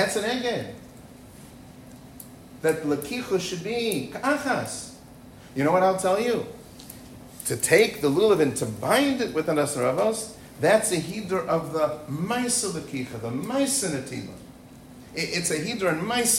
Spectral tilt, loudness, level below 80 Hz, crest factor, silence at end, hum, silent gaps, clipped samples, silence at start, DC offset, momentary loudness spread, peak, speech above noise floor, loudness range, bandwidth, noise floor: -3.5 dB/octave; -25 LUFS; -58 dBFS; 20 dB; 0 s; none; none; under 0.1%; 0 s; under 0.1%; 22 LU; -6 dBFS; 22 dB; 6 LU; 16 kHz; -46 dBFS